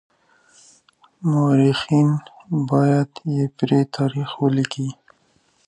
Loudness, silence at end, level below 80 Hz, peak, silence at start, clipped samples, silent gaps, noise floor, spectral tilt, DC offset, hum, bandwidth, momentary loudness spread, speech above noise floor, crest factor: -20 LUFS; 0.75 s; -64 dBFS; -6 dBFS; 1.2 s; under 0.1%; none; -62 dBFS; -7.5 dB/octave; under 0.1%; none; 10.5 kHz; 9 LU; 43 dB; 16 dB